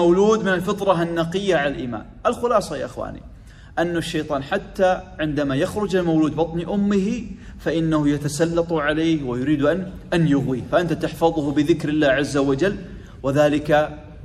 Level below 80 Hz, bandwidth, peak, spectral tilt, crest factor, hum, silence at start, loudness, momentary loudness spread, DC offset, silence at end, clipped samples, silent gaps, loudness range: -42 dBFS; 14 kHz; -4 dBFS; -6 dB/octave; 16 dB; none; 0 s; -21 LUFS; 10 LU; under 0.1%; 0 s; under 0.1%; none; 3 LU